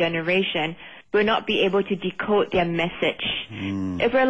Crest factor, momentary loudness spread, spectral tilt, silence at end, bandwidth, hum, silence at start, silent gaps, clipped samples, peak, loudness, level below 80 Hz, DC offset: 12 dB; 7 LU; -6.5 dB/octave; 0 s; 8 kHz; none; 0 s; none; under 0.1%; -10 dBFS; -23 LUFS; -52 dBFS; 0.3%